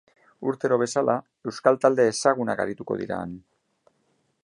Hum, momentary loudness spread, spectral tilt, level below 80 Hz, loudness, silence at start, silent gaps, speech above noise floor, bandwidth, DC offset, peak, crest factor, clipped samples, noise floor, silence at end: none; 12 LU; -5 dB/octave; -64 dBFS; -24 LUFS; 0.4 s; none; 46 dB; 11 kHz; under 0.1%; -4 dBFS; 22 dB; under 0.1%; -70 dBFS; 1.05 s